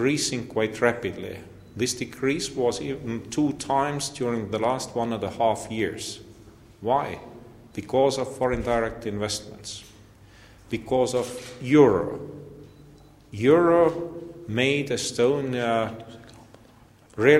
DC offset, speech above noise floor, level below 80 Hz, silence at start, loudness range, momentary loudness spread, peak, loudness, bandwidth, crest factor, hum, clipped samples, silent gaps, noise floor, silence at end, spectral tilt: under 0.1%; 29 dB; -52 dBFS; 0 s; 5 LU; 19 LU; -4 dBFS; -25 LUFS; 15 kHz; 22 dB; none; under 0.1%; none; -53 dBFS; 0 s; -5 dB/octave